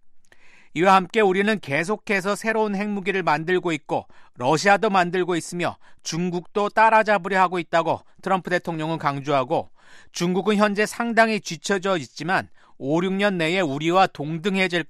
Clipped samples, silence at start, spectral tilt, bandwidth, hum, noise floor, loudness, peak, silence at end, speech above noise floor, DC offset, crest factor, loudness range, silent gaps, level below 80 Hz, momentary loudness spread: under 0.1%; 0.05 s; -5 dB/octave; 13.5 kHz; none; -47 dBFS; -22 LUFS; -4 dBFS; 0 s; 25 dB; under 0.1%; 18 dB; 2 LU; none; -62 dBFS; 10 LU